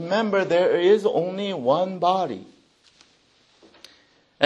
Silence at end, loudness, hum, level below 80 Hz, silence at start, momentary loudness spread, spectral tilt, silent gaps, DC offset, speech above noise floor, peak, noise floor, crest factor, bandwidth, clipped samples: 0 s; -22 LUFS; none; -74 dBFS; 0 s; 8 LU; -6 dB/octave; none; under 0.1%; 39 dB; -2 dBFS; -60 dBFS; 22 dB; 9.4 kHz; under 0.1%